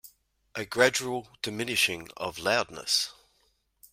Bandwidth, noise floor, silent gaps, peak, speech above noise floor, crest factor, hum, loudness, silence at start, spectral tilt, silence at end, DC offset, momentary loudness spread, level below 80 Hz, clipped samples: 16 kHz; -70 dBFS; none; -6 dBFS; 42 dB; 24 dB; none; -28 LUFS; 0.05 s; -2 dB/octave; 0.8 s; under 0.1%; 12 LU; -66 dBFS; under 0.1%